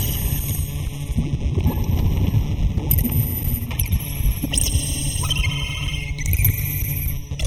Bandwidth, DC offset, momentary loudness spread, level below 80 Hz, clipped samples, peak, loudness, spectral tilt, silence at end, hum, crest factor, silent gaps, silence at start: 19 kHz; under 0.1%; 6 LU; -26 dBFS; under 0.1%; -2 dBFS; -22 LUFS; -4.5 dB/octave; 0 s; none; 18 dB; none; 0 s